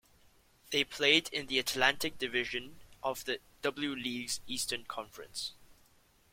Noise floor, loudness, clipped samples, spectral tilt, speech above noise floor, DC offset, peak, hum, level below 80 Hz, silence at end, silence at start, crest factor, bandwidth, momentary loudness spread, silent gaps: -66 dBFS; -33 LUFS; under 0.1%; -1.5 dB/octave; 32 dB; under 0.1%; -10 dBFS; none; -66 dBFS; 0.6 s; 0.65 s; 26 dB; 16.5 kHz; 13 LU; none